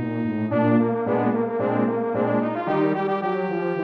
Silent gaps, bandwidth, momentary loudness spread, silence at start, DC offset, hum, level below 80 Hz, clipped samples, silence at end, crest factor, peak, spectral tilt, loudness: none; 5.2 kHz; 5 LU; 0 s; under 0.1%; none; -66 dBFS; under 0.1%; 0 s; 14 dB; -8 dBFS; -10 dB/octave; -23 LUFS